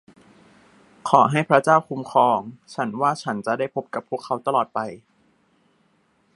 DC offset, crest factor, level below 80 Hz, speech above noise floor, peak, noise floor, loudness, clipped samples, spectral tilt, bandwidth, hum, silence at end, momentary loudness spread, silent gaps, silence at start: under 0.1%; 22 dB; -70 dBFS; 43 dB; 0 dBFS; -64 dBFS; -21 LUFS; under 0.1%; -6 dB/octave; 11.5 kHz; none; 1.4 s; 13 LU; none; 1.05 s